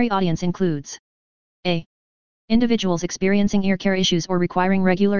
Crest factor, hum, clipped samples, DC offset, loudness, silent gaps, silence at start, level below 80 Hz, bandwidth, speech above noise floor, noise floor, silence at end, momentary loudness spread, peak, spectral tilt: 16 dB; none; under 0.1%; 3%; -21 LUFS; 0.99-1.63 s, 1.86-2.48 s; 0 s; -48 dBFS; 7.2 kHz; over 71 dB; under -90 dBFS; 0 s; 8 LU; -4 dBFS; -5.5 dB/octave